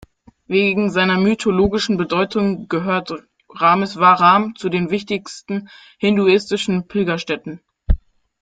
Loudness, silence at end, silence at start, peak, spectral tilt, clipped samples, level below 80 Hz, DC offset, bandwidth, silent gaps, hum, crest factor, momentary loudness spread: -18 LUFS; 0.45 s; 0.5 s; -2 dBFS; -6 dB/octave; under 0.1%; -32 dBFS; under 0.1%; 9.2 kHz; none; none; 16 dB; 13 LU